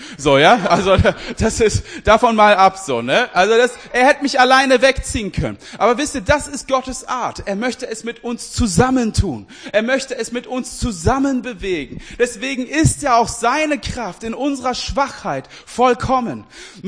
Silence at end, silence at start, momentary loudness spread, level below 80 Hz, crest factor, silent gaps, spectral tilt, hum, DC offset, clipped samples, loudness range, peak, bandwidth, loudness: 0 s; 0 s; 14 LU; -34 dBFS; 16 dB; none; -4.5 dB/octave; none; under 0.1%; under 0.1%; 7 LU; 0 dBFS; 10.5 kHz; -16 LUFS